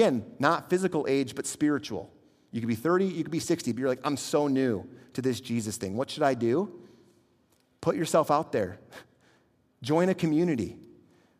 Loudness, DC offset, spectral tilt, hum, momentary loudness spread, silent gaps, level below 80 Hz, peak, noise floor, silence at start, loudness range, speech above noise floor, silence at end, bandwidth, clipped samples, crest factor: -28 LUFS; under 0.1%; -5.5 dB/octave; none; 10 LU; none; -70 dBFS; -8 dBFS; -67 dBFS; 0 s; 2 LU; 40 dB; 0.55 s; 15.5 kHz; under 0.1%; 22 dB